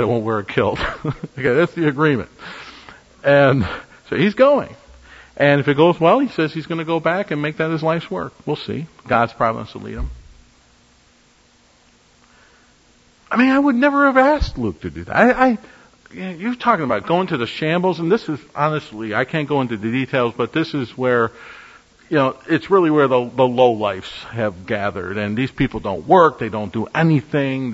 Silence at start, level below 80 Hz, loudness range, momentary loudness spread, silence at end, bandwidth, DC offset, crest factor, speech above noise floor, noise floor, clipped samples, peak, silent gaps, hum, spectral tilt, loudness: 0 s; -42 dBFS; 6 LU; 14 LU; 0 s; 8 kHz; under 0.1%; 18 dB; 36 dB; -54 dBFS; under 0.1%; 0 dBFS; none; none; -7.5 dB/octave; -18 LUFS